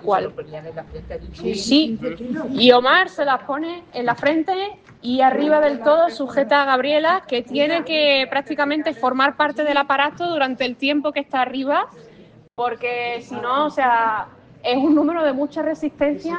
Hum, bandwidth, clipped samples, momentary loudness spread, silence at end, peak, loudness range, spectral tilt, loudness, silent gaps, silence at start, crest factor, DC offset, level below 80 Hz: none; 9.2 kHz; under 0.1%; 12 LU; 0 s; 0 dBFS; 4 LU; -4.5 dB/octave; -19 LUFS; none; 0.05 s; 20 dB; under 0.1%; -52 dBFS